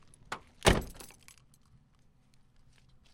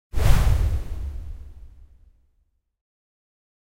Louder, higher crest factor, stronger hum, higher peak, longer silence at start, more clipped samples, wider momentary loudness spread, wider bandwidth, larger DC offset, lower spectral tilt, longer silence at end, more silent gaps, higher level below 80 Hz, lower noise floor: second, -31 LUFS vs -25 LUFS; first, 30 dB vs 20 dB; neither; second, -8 dBFS vs -4 dBFS; first, 0.3 s vs 0.1 s; neither; about the same, 23 LU vs 21 LU; about the same, 16.5 kHz vs 16 kHz; neither; second, -4 dB/octave vs -6 dB/octave; first, 2.1 s vs 0.95 s; neither; second, -44 dBFS vs -26 dBFS; about the same, -65 dBFS vs -68 dBFS